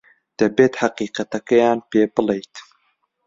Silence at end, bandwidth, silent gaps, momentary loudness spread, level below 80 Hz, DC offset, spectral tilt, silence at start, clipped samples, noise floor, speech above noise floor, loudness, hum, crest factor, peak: 0.65 s; 7.8 kHz; none; 10 LU; -60 dBFS; under 0.1%; -5.5 dB/octave; 0.4 s; under 0.1%; -67 dBFS; 49 dB; -19 LUFS; none; 18 dB; -2 dBFS